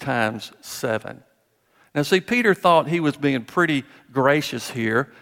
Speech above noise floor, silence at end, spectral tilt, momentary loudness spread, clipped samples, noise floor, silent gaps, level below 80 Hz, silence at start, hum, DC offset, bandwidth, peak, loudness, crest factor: 42 dB; 0.15 s; -5 dB/octave; 12 LU; under 0.1%; -64 dBFS; none; -64 dBFS; 0 s; none; under 0.1%; 17 kHz; -4 dBFS; -21 LUFS; 18 dB